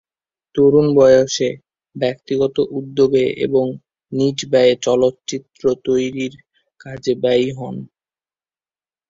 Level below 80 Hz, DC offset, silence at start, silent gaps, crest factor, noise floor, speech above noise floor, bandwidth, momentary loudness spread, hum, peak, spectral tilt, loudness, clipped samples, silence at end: -56 dBFS; under 0.1%; 0.55 s; none; 16 dB; under -90 dBFS; over 74 dB; 7.8 kHz; 16 LU; none; -2 dBFS; -5.5 dB/octave; -17 LUFS; under 0.1%; 1.25 s